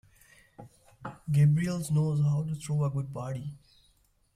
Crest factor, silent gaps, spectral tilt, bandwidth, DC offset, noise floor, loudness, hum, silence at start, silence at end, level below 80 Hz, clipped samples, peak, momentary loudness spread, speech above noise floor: 16 dB; none; -7.5 dB/octave; 14 kHz; under 0.1%; -67 dBFS; -29 LUFS; none; 0.6 s; 0.8 s; -60 dBFS; under 0.1%; -14 dBFS; 18 LU; 40 dB